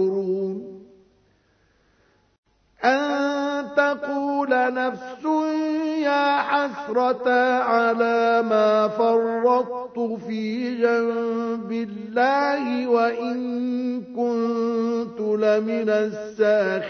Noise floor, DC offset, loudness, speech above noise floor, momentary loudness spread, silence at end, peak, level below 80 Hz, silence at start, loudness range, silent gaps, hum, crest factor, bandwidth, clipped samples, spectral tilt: -63 dBFS; under 0.1%; -22 LUFS; 41 dB; 8 LU; 0 s; -4 dBFS; -70 dBFS; 0 s; 5 LU; 2.38-2.43 s; none; 18 dB; 6.6 kHz; under 0.1%; -6 dB/octave